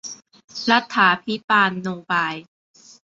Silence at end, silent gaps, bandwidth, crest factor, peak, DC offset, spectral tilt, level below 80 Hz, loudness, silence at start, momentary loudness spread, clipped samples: 0.6 s; 0.44-0.48 s, 1.44-1.48 s; 7.8 kHz; 20 dB; -2 dBFS; under 0.1%; -3.5 dB/octave; -68 dBFS; -19 LUFS; 0.05 s; 18 LU; under 0.1%